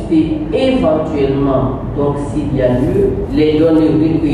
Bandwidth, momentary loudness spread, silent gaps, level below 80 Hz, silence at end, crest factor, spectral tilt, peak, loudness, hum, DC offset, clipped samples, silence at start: 10 kHz; 6 LU; none; -28 dBFS; 0 s; 10 dB; -8.5 dB/octave; -2 dBFS; -14 LUFS; none; under 0.1%; under 0.1%; 0 s